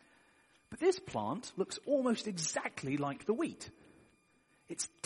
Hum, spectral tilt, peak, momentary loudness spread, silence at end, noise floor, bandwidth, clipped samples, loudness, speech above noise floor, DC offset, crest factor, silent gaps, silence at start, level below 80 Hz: none; -4 dB/octave; -18 dBFS; 12 LU; 0.2 s; -71 dBFS; 11.5 kHz; under 0.1%; -36 LUFS; 35 dB; under 0.1%; 20 dB; none; 0.7 s; -74 dBFS